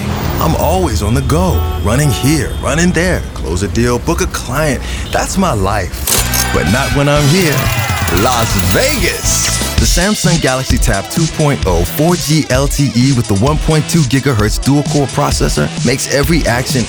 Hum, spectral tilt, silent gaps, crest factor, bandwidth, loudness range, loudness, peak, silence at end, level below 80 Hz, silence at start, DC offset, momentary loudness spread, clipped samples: none; -4.5 dB/octave; none; 12 dB; over 20 kHz; 3 LU; -12 LUFS; 0 dBFS; 0 s; -22 dBFS; 0 s; 0.2%; 4 LU; under 0.1%